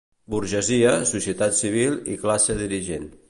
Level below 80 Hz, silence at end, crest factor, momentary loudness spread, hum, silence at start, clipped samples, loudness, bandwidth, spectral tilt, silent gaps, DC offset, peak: -46 dBFS; 0.15 s; 16 dB; 9 LU; none; 0.3 s; under 0.1%; -22 LUFS; 11.5 kHz; -3.5 dB/octave; none; under 0.1%; -6 dBFS